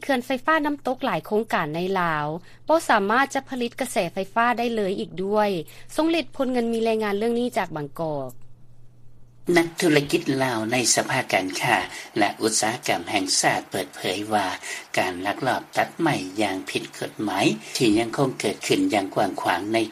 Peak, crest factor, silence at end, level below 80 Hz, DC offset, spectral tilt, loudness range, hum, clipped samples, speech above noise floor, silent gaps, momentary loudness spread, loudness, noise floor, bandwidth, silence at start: -2 dBFS; 20 dB; 0 s; -56 dBFS; under 0.1%; -3.5 dB/octave; 4 LU; none; under 0.1%; 20 dB; none; 9 LU; -23 LUFS; -43 dBFS; 15.5 kHz; 0 s